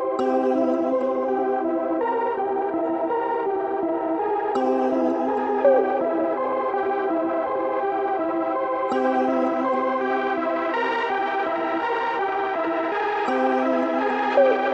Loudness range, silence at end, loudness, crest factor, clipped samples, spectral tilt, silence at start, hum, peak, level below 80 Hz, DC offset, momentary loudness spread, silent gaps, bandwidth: 2 LU; 0 s; -23 LUFS; 16 dB; under 0.1%; -6 dB/octave; 0 s; none; -6 dBFS; -66 dBFS; under 0.1%; 4 LU; none; 8 kHz